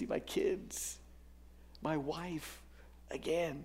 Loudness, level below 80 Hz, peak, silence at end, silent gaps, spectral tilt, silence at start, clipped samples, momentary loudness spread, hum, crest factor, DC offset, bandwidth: -39 LUFS; -58 dBFS; -22 dBFS; 0 s; none; -4.5 dB/octave; 0 s; under 0.1%; 20 LU; none; 18 dB; under 0.1%; 16 kHz